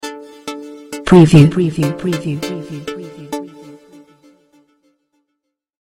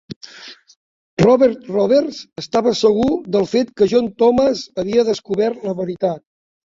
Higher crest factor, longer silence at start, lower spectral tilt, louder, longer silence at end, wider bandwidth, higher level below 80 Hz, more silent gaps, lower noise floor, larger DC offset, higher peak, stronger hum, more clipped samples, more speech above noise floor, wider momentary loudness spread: about the same, 16 dB vs 16 dB; about the same, 0.05 s vs 0.1 s; first, -7.5 dB/octave vs -6 dB/octave; first, -13 LUFS vs -17 LUFS; first, 2.1 s vs 0.45 s; first, 14.5 kHz vs 7.8 kHz; first, -42 dBFS vs -50 dBFS; second, none vs 0.16-0.21 s, 0.76-1.17 s; first, -75 dBFS vs -40 dBFS; neither; about the same, 0 dBFS vs -2 dBFS; neither; first, 0.3% vs under 0.1%; first, 63 dB vs 24 dB; first, 22 LU vs 16 LU